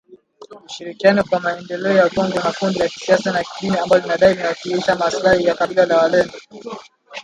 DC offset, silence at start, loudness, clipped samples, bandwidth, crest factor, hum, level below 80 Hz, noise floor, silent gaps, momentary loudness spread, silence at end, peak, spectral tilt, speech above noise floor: under 0.1%; 0.1 s; -17 LUFS; under 0.1%; 11 kHz; 18 dB; none; -52 dBFS; -42 dBFS; none; 18 LU; 0 s; 0 dBFS; -5 dB/octave; 26 dB